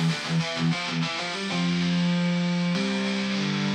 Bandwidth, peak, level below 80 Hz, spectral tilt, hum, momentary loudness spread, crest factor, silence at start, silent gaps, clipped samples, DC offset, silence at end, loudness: 9.8 kHz; -14 dBFS; -66 dBFS; -5.5 dB/octave; none; 3 LU; 12 dB; 0 s; none; under 0.1%; under 0.1%; 0 s; -25 LUFS